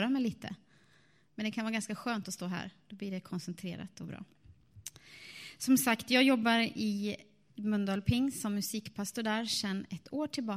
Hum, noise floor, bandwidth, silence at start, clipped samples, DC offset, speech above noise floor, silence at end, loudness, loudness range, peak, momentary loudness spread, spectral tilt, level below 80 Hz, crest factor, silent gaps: none; -67 dBFS; 15.5 kHz; 0 s; under 0.1%; under 0.1%; 34 dB; 0 s; -33 LUFS; 11 LU; -14 dBFS; 20 LU; -4 dB/octave; -62 dBFS; 20 dB; none